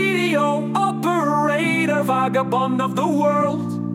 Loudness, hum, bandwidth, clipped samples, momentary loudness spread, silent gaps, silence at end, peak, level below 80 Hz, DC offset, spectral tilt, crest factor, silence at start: -19 LUFS; none; 17 kHz; under 0.1%; 2 LU; none; 0 s; -8 dBFS; -64 dBFS; under 0.1%; -6 dB/octave; 12 dB; 0 s